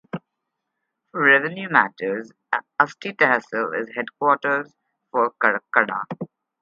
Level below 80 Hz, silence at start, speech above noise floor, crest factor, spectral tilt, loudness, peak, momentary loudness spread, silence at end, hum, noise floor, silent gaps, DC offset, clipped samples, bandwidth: -76 dBFS; 0.15 s; 58 dB; 22 dB; -6 dB/octave; -21 LUFS; 0 dBFS; 16 LU; 0.35 s; none; -80 dBFS; none; under 0.1%; under 0.1%; 7.4 kHz